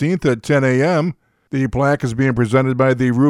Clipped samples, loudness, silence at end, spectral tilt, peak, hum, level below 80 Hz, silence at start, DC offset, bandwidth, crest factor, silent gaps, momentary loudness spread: under 0.1%; -17 LUFS; 0 s; -7.5 dB/octave; -2 dBFS; none; -42 dBFS; 0 s; under 0.1%; 11.5 kHz; 14 dB; none; 6 LU